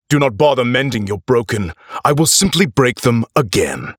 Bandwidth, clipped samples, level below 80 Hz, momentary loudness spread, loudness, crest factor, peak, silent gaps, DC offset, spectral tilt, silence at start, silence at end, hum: over 20 kHz; under 0.1%; -44 dBFS; 9 LU; -15 LUFS; 14 dB; 0 dBFS; none; under 0.1%; -4 dB/octave; 0.1 s; 0.05 s; none